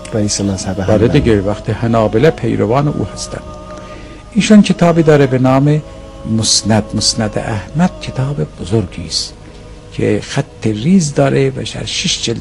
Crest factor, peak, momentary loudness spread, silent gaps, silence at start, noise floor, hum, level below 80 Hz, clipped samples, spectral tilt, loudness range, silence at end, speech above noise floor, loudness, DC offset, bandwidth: 14 dB; 0 dBFS; 14 LU; none; 0 s; -33 dBFS; none; -34 dBFS; 0.3%; -5 dB/octave; 6 LU; 0 s; 20 dB; -13 LUFS; under 0.1%; 11.5 kHz